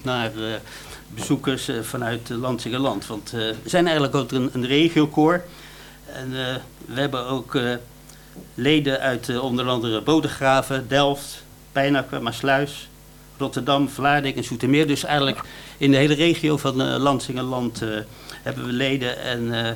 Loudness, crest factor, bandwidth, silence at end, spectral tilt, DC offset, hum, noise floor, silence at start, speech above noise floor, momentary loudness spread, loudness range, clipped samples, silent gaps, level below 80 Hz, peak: -22 LUFS; 20 dB; 18 kHz; 0 s; -5 dB/octave; under 0.1%; none; -46 dBFS; 0 s; 24 dB; 14 LU; 5 LU; under 0.1%; none; -50 dBFS; -2 dBFS